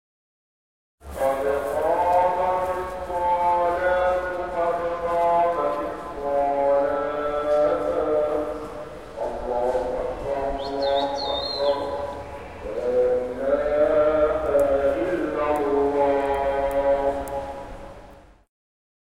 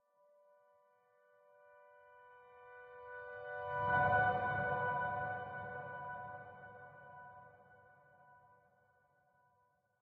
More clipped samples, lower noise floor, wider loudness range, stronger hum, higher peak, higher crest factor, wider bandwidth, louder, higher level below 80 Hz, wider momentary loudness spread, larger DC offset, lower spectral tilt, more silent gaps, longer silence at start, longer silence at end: neither; second, -47 dBFS vs -77 dBFS; second, 4 LU vs 20 LU; neither; first, -8 dBFS vs -22 dBFS; second, 14 dB vs 22 dB; first, 16 kHz vs 4.8 kHz; first, -23 LUFS vs -38 LUFS; first, -44 dBFS vs -68 dBFS; second, 11 LU vs 26 LU; first, 0.3% vs under 0.1%; first, -5.5 dB/octave vs -4 dB/octave; neither; second, 1 s vs 1.7 s; second, 0.8 s vs 1.7 s